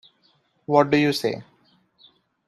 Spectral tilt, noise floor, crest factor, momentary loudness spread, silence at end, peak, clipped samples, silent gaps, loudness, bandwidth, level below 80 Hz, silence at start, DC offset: -5.5 dB/octave; -64 dBFS; 22 dB; 18 LU; 1.05 s; -4 dBFS; under 0.1%; none; -21 LUFS; 14 kHz; -66 dBFS; 0.7 s; under 0.1%